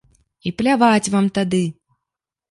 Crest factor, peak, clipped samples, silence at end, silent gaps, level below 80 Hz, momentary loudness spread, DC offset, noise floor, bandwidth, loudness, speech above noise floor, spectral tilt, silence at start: 18 dB; -2 dBFS; under 0.1%; 0.8 s; none; -56 dBFS; 13 LU; under 0.1%; -84 dBFS; 11.5 kHz; -18 LUFS; 67 dB; -5.5 dB/octave; 0.45 s